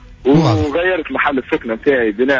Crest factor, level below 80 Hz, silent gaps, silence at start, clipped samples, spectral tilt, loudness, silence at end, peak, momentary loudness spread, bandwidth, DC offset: 14 dB; -38 dBFS; none; 0.1 s; under 0.1%; -7 dB/octave; -15 LUFS; 0 s; -2 dBFS; 5 LU; 7.6 kHz; under 0.1%